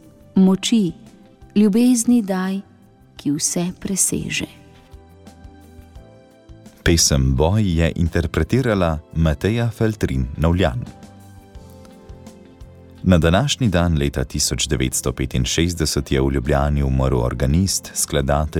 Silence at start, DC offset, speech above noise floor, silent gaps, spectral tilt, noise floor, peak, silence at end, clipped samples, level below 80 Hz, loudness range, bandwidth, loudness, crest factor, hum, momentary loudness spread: 0.35 s; under 0.1%; 30 dB; none; -5 dB/octave; -48 dBFS; -2 dBFS; 0 s; under 0.1%; -30 dBFS; 5 LU; 17.5 kHz; -19 LUFS; 16 dB; none; 8 LU